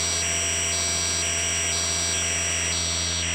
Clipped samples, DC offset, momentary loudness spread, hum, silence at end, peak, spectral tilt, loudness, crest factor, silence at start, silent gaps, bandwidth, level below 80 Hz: under 0.1%; under 0.1%; 1 LU; none; 0 s; -10 dBFS; -0.5 dB/octave; -22 LUFS; 14 dB; 0 s; none; 16 kHz; -42 dBFS